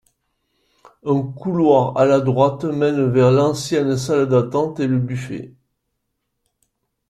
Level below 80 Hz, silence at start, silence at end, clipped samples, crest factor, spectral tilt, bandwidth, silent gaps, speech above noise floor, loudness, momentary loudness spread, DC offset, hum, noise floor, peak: -54 dBFS; 1.05 s; 1.6 s; under 0.1%; 18 dB; -7 dB/octave; 12.5 kHz; none; 57 dB; -18 LUFS; 9 LU; under 0.1%; none; -74 dBFS; -2 dBFS